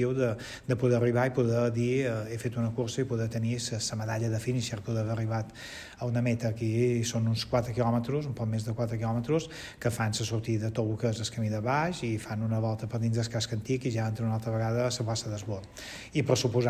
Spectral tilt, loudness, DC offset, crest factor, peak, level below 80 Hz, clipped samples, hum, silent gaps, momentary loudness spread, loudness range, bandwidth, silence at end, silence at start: -6 dB/octave; -30 LUFS; under 0.1%; 18 dB; -10 dBFS; -54 dBFS; under 0.1%; none; none; 7 LU; 3 LU; 15 kHz; 0 s; 0 s